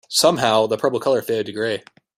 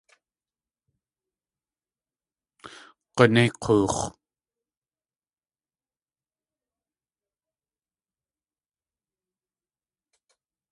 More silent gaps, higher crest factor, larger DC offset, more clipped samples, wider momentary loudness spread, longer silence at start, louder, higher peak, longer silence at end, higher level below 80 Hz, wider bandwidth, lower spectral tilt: neither; second, 18 dB vs 30 dB; neither; neither; second, 9 LU vs 15 LU; second, 0.1 s vs 2.65 s; first, -19 LUFS vs -22 LUFS; about the same, -2 dBFS vs -2 dBFS; second, 0.4 s vs 6.6 s; about the same, -62 dBFS vs -58 dBFS; first, 16 kHz vs 11.5 kHz; second, -3 dB/octave vs -5.5 dB/octave